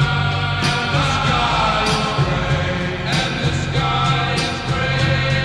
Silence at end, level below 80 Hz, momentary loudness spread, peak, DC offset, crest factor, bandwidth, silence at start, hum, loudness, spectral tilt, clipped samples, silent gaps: 0 s; -32 dBFS; 4 LU; -4 dBFS; under 0.1%; 14 dB; 11.5 kHz; 0 s; none; -18 LUFS; -5 dB/octave; under 0.1%; none